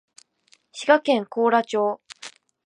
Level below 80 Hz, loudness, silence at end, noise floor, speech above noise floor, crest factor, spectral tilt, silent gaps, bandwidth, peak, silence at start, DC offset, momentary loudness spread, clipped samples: -82 dBFS; -21 LUFS; 0.4 s; -62 dBFS; 41 dB; 20 dB; -4 dB/octave; none; 11 kHz; -4 dBFS; 0.75 s; under 0.1%; 22 LU; under 0.1%